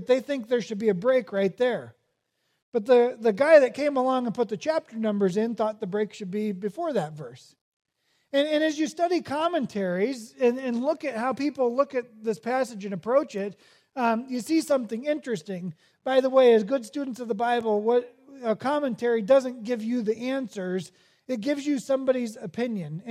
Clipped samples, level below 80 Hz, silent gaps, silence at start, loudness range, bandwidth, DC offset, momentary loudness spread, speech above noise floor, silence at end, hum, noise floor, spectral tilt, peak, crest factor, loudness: under 0.1%; -78 dBFS; 2.62-2.72 s, 7.61-7.80 s; 0 s; 6 LU; 14 kHz; under 0.1%; 12 LU; 50 dB; 0 s; none; -75 dBFS; -5.5 dB/octave; -6 dBFS; 20 dB; -26 LUFS